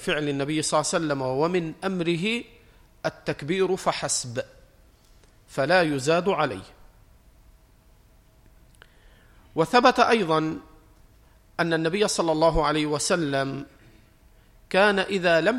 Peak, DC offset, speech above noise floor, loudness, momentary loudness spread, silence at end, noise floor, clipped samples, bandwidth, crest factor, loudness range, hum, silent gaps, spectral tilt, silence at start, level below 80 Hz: -4 dBFS; under 0.1%; 33 dB; -24 LUFS; 13 LU; 0 s; -56 dBFS; under 0.1%; 15.5 kHz; 20 dB; 5 LU; none; none; -4 dB/octave; 0 s; -48 dBFS